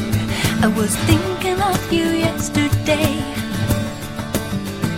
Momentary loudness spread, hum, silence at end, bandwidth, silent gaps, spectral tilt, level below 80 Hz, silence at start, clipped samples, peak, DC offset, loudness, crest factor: 7 LU; none; 0 s; 16.5 kHz; none; -5 dB/octave; -34 dBFS; 0 s; under 0.1%; 0 dBFS; under 0.1%; -19 LUFS; 18 dB